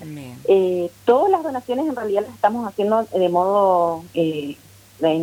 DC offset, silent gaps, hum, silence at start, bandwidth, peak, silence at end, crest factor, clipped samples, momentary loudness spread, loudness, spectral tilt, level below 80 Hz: under 0.1%; none; none; 0 s; 16.5 kHz; -4 dBFS; 0 s; 16 dB; under 0.1%; 9 LU; -20 LUFS; -6.5 dB/octave; -62 dBFS